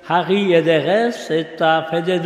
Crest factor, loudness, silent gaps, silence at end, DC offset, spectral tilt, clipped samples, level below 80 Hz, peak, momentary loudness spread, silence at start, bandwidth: 14 dB; -17 LUFS; none; 0 s; under 0.1%; -6 dB/octave; under 0.1%; -68 dBFS; -2 dBFS; 6 LU; 0.05 s; 12.5 kHz